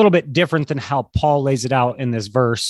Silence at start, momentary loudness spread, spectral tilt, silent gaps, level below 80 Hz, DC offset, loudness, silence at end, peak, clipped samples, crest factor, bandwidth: 0 s; 5 LU; -5.5 dB/octave; none; -40 dBFS; under 0.1%; -19 LUFS; 0 s; -2 dBFS; under 0.1%; 16 dB; 12.5 kHz